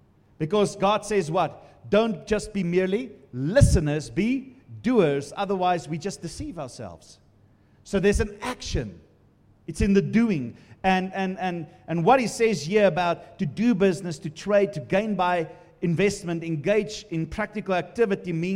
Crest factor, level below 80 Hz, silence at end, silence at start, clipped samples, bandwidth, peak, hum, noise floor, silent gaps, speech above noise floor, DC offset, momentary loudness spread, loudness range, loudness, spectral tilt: 22 dB; -40 dBFS; 0 s; 0.4 s; under 0.1%; 15 kHz; -4 dBFS; none; -58 dBFS; none; 34 dB; under 0.1%; 13 LU; 5 LU; -25 LUFS; -6 dB/octave